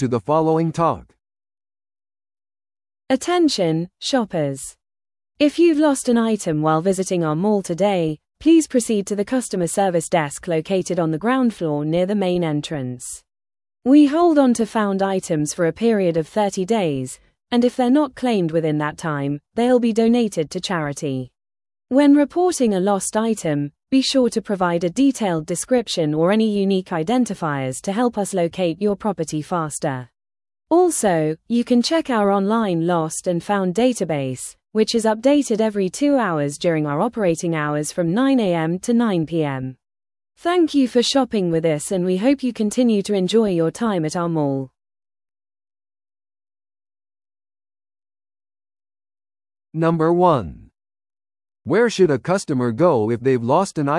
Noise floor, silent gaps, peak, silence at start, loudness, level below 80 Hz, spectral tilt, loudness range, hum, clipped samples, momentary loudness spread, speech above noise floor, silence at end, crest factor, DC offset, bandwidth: under -90 dBFS; none; -2 dBFS; 0 s; -19 LUFS; -56 dBFS; -5.5 dB/octave; 4 LU; none; under 0.1%; 8 LU; over 71 dB; 0 s; 18 dB; under 0.1%; 12 kHz